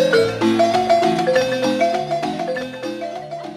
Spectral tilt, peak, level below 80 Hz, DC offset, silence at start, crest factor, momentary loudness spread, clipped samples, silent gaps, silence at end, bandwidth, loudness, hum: -5 dB/octave; -4 dBFS; -56 dBFS; under 0.1%; 0 s; 14 dB; 12 LU; under 0.1%; none; 0 s; 14.5 kHz; -19 LUFS; none